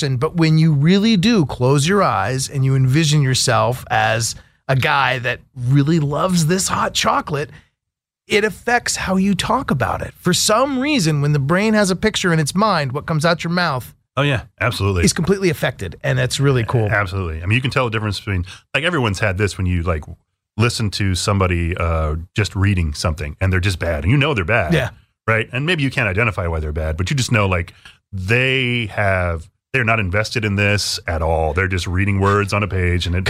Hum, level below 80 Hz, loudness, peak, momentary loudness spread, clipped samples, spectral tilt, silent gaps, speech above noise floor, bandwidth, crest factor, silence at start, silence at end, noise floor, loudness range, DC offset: none; -34 dBFS; -18 LUFS; -4 dBFS; 7 LU; under 0.1%; -5 dB/octave; none; 65 dB; 15.5 kHz; 14 dB; 0 s; 0 s; -82 dBFS; 3 LU; under 0.1%